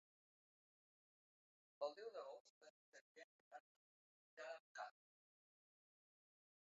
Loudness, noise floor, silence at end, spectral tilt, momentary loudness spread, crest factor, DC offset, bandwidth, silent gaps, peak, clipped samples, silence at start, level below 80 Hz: -56 LUFS; under -90 dBFS; 1.75 s; 1.5 dB/octave; 17 LU; 26 dB; under 0.1%; 7.4 kHz; 2.40-2.61 s, 2.70-2.92 s, 3.01-3.15 s, 3.24-3.51 s, 3.60-4.37 s, 4.60-4.75 s; -36 dBFS; under 0.1%; 1.8 s; under -90 dBFS